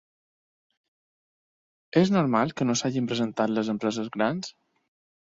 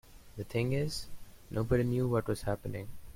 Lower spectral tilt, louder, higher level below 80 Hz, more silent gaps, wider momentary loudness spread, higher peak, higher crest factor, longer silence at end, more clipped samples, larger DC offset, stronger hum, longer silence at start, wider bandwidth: about the same, -5.5 dB/octave vs -6.5 dB/octave; first, -26 LUFS vs -34 LUFS; second, -66 dBFS vs -50 dBFS; neither; second, 6 LU vs 15 LU; first, -8 dBFS vs -14 dBFS; about the same, 20 dB vs 18 dB; first, 0.7 s vs 0 s; neither; neither; neither; first, 1.95 s vs 0.05 s; second, 7.8 kHz vs 16.5 kHz